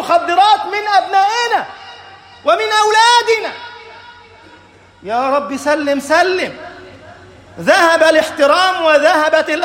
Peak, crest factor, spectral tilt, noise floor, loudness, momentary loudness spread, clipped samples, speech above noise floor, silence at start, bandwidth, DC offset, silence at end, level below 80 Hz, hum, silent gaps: 0 dBFS; 14 dB; -2 dB/octave; -43 dBFS; -12 LUFS; 18 LU; under 0.1%; 31 dB; 0 s; 16.5 kHz; under 0.1%; 0 s; -58 dBFS; none; none